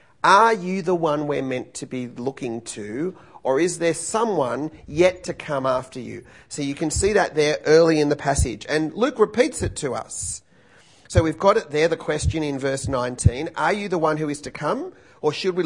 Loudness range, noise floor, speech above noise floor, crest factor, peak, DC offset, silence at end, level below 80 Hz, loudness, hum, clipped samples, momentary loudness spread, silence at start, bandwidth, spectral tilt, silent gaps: 5 LU; -54 dBFS; 32 dB; 22 dB; 0 dBFS; 0.1%; 0 s; -40 dBFS; -22 LUFS; none; under 0.1%; 13 LU; 0.25 s; 11 kHz; -5 dB/octave; none